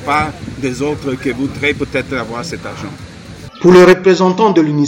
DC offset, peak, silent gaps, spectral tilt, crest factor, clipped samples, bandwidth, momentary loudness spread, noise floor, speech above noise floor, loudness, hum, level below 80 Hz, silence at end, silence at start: under 0.1%; 0 dBFS; none; -6 dB/octave; 12 dB; under 0.1%; 12 kHz; 21 LU; -32 dBFS; 20 dB; -13 LUFS; none; -40 dBFS; 0 s; 0 s